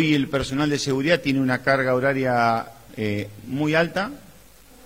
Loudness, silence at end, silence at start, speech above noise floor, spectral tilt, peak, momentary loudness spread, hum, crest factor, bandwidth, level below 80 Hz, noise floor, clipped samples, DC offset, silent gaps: -22 LUFS; 0.65 s; 0 s; 28 dB; -5.5 dB/octave; -4 dBFS; 10 LU; none; 20 dB; 16 kHz; -50 dBFS; -50 dBFS; under 0.1%; 0.2%; none